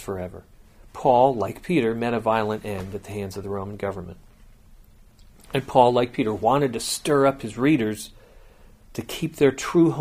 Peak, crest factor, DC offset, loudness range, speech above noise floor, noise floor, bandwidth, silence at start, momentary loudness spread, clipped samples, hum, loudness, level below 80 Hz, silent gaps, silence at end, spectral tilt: -2 dBFS; 22 dB; under 0.1%; 7 LU; 28 dB; -50 dBFS; 15.5 kHz; 0 s; 15 LU; under 0.1%; none; -23 LUFS; -50 dBFS; none; 0 s; -5.5 dB/octave